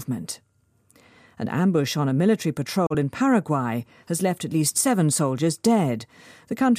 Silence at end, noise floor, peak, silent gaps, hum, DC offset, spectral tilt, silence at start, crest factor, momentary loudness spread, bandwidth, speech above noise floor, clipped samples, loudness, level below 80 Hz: 0 s; -63 dBFS; -6 dBFS; none; none; under 0.1%; -5 dB/octave; 0 s; 16 dB; 12 LU; 15.5 kHz; 40 dB; under 0.1%; -23 LUFS; -62 dBFS